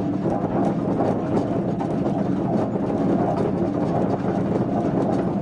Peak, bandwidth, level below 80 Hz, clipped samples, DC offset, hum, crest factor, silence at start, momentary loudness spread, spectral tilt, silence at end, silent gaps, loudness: -10 dBFS; 9.4 kHz; -48 dBFS; under 0.1%; under 0.1%; none; 12 dB; 0 s; 2 LU; -9.5 dB/octave; 0 s; none; -23 LUFS